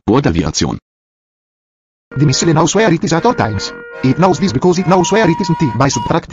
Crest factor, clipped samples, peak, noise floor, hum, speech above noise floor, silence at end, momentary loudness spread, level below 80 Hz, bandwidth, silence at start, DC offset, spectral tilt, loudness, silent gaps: 14 dB; under 0.1%; 0 dBFS; under -90 dBFS; none; over 77 dB; 0 s; 7 LU; -36 dBFS; 7.8 kHz; 0.05 s; under 0.1%; -5.5 dB/octave; -13 LUFS; 0.82-2.11 s